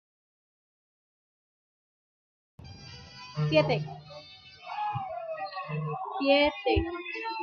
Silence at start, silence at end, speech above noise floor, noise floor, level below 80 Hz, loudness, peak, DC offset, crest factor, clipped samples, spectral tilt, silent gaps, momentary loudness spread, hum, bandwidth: 2.6 s; 0 s; 22 dB; -50 dBFS; -50 dBFS; -29 LUFS; -10 dBFS; under 0.1%; 22 dB; under 0.1%; -7 dB/octave; none; 22 LU; none; 6.8 kHz